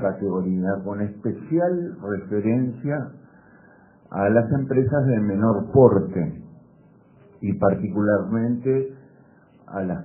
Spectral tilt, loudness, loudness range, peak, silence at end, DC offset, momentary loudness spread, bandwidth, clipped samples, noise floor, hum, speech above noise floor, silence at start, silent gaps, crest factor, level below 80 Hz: -6.5 dB/octave; -22 LUFS; 5 LU; -2 dBFS; 0 s; under 0.1%; 11 LU; 2.8 kHz; under 0.1%; -53 dBFS; none; 31 dB; 0 s; none; 22 dB; -54 dBFS